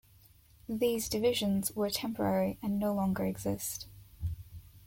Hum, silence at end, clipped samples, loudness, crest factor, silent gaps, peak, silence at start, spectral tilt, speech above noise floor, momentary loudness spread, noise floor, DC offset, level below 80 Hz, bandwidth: none; 0.1 s; under 0.1%; -33 LUFS; 16 dB; none; -18 dBFS; 0.7 s; -5 dB/octave; 29 dB; 12 LU; -61 dBFS; under 0.1%; -54 dBFS; 17 kHz